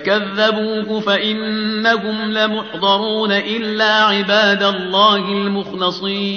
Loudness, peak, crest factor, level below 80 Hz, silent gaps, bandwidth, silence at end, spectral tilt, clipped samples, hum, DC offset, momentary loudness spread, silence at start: -16 LUFS; -2 dBFS; 14 dB; -62 dBFS; none; 6.8 kHz; 0 s; -1.5 dB/octave; under 0.1%; none; under 0.1%; 7 LU; 0 s